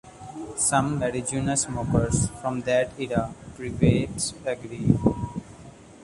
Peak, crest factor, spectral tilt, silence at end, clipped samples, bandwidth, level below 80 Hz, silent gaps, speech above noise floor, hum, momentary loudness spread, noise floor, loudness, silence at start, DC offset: -4 dBFS; 22 dB; -5 dB/octave; 0 s; under 0.1%; 11.5 kHz; -42 dBFS; none; 22 dB; none; 13 LU; -46 dBFS; -25 LUFS; 0.05 s; under 0.1%